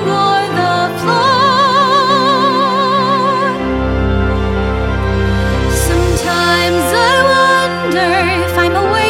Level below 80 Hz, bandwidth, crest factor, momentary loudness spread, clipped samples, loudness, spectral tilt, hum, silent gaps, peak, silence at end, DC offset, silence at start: -24 dBFS; 16.5 kHz; 12 dB; 6 LU; under 0.1%; -12 LUFS; -4.5 dB/octave; none; none; 0 dBFS; 0 s; under 0.1%; 0 s